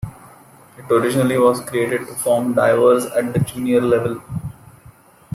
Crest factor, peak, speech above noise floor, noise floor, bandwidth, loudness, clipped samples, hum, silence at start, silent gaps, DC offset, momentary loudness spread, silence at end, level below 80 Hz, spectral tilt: 16 dB; -2 dBFS; 30 dB; -47 dBFS; 15.5 kHz; -17 LUFS; under 0.1%; none; 0.05 s; none; under 0.1%; 14 LU; 0.85 s; -50 dBFS; -6 dB/octave